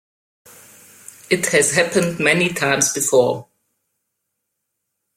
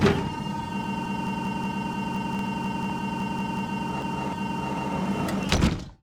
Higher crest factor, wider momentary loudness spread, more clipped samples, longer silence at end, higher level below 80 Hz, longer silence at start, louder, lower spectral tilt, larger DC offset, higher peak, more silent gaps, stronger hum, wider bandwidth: about the same, 20 dB vs 24 dB; about the same, 6 LU vs 6 LU; neither; first, 1.75 s vs 0.1 s; second, -60 dBFS vs -42 dBFS; first, 1.3 s vs 0 s; first, -17 LUFS vs -28 LUFS; second, -3 dB/octave vs -6 dB/octave; neither; about the same, -2 dBFS vs -4 dBFS; neither; neither; about the same, 16.5 kHz vs 16 kHz